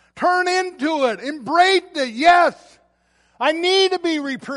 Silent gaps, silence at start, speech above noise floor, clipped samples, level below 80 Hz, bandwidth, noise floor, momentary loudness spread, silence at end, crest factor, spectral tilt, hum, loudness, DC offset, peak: none; 0.15 s; 43 dB; under 0.1%; -62 dBFS; 11.5 kHz; -61 dBFS; 8 LU; 0 s; 16 dB; -2.5 dB/octave; none; -18 LUFS; under 0.1%; -2 dBFS